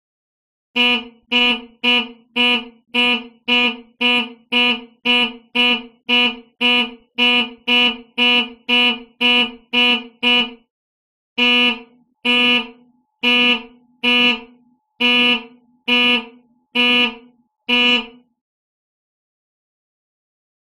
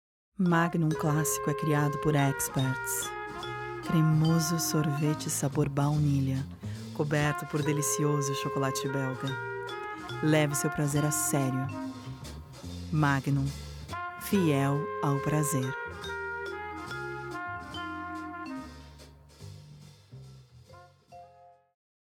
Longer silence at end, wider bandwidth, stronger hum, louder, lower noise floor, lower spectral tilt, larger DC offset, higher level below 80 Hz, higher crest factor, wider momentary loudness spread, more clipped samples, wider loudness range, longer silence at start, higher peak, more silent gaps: first, 2.55 s vs 0.55 s; second, 14 kHz vs 18 kHz; neither; first, -15 LUFS vs -30 LUFS; about the same, -54 dBFS vs -57 dBFS; second, -2.5 dB/octave vs -5.5 dB/octave; neither; about the same, -56 dBFS vs -56 dBFS; about the same, 16 dB vs 20 dB; second, 8 LU vs 14 LU; neither; second, 2 LU vs 11 LU; first, 0.75 s vs 0.4 s; first, -4 dBFS vs -12 dBFS; first, 10.70-11.36 s vs none